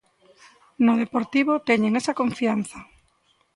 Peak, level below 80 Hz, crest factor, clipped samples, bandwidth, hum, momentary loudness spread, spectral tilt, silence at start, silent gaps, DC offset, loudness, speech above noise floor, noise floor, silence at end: -6 dBFS; -64 dBFS; 18 dB; under 0.1%; 11.5 kHz; none; 7 LU; -5.5 dB/octave; 0.8 s; none; under 0.1%; -22 LUFS; 43 dB; -65 dBFS; 0.7 s